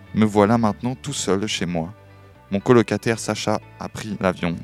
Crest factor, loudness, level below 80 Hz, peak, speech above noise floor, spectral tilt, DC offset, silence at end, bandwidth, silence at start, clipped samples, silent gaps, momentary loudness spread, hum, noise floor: 20 dB; -21 LUFS; -52 dBFS; 0 dBFS; 26 dB; -5.5 dB/octave; under 0.1%; 0 s; 14 kHz; 0 s; under 0.1%; none; 12 LU; none; -47 dBFS